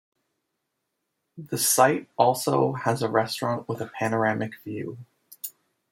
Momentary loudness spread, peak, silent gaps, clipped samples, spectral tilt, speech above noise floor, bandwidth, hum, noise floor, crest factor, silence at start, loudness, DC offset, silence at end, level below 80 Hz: 18 LU; -4 dBFS; none; under 0.1%; -4 dB/octave; 55 dB; 16.5 kHz; none; -80 dBFS; 24 dB; 1.35 s; -24 LUFS; under 0.1%; 0.4 s; -70 dBFS